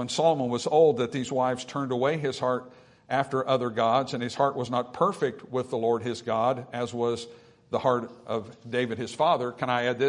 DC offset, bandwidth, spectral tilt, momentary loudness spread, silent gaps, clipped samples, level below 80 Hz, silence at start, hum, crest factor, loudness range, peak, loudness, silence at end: under 0.1%; 11 kHz; -5.5 dB/octave; 8 LU; none; under 0.1%; -70 dBFS; 0 s; none; 18 dB; 3 LU; -8 dBFS; -27 LUFS; 0 s